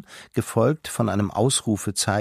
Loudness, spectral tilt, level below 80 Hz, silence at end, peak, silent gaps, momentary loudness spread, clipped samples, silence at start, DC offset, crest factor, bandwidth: -23 LUFS; -4.5 dB/octave; -56 dBFS; 0 s; -6 dBFS; none; 5 LU; under 0.1%; 0.1 s; under 0.1%; 18 dB; 15.5 kHz